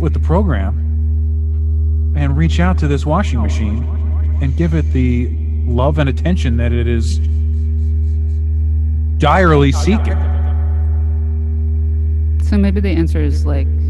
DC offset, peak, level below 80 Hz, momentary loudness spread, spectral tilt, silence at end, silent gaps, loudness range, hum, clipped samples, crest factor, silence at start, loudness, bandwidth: under 0.1%; 0 dBFS; -16 dBFS; 4 LU; -8 dB/octave; 0 s; none; 2 LU; none; under 0.1%; 12 dB; 0 s; -16 LUFS; 7.8 kHz